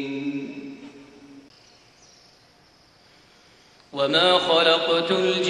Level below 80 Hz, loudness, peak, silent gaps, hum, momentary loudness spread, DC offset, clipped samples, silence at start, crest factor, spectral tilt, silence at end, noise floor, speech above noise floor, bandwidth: -68 dBFS; -20 LUFS; -4 dBFS; none; none; 20 LU; under 0.1%; under 0.1%; 0 s; 20 dB; -4 dB/octave; 0 s; -56 dBFS; 36 dB; 10.5 kHz